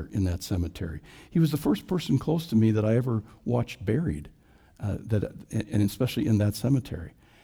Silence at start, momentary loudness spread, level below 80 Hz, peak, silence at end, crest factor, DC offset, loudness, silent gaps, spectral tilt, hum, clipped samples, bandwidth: 0 s; 13 LU; -48 dBFS; -12 dBFS; 0.35 s; 14 dB; under 0.1%; -27 LUFS; none; -7.5 dB/octave; none; under 0.1%; over 20 kHz